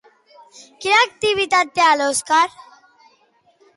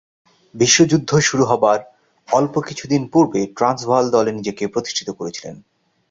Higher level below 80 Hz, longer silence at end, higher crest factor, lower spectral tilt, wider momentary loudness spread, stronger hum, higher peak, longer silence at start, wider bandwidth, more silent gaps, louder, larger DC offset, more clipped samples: about the same, -60 dBFS vs -56 dBFS; first, 1.3 s vs 0.55 s; about the same, 16 dB vs 18 dB; second, -1 dB/octave vs -4 dB/octave; second, 5 LU vs 11 LU; neither; about the same, -4 dBFS vs -2 dBFS; first, 0.8 s vs 0.55 s; first, 11.5 kHz vs 7.8 kHz; neither; about the same, -17 LUFS vs -17 LUFS; neither; neither